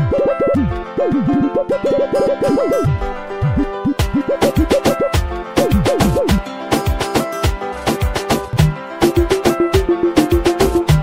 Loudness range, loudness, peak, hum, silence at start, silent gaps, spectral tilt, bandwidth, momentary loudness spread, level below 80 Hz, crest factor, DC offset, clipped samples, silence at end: 1 LU; -16 LUFS; -2 dBFS; none; 0 s; none; -6 dB/octave; 16 kHz; 5 LU; -26 dBFS; 14 dB; 0.5%; under 0.1%; 0 s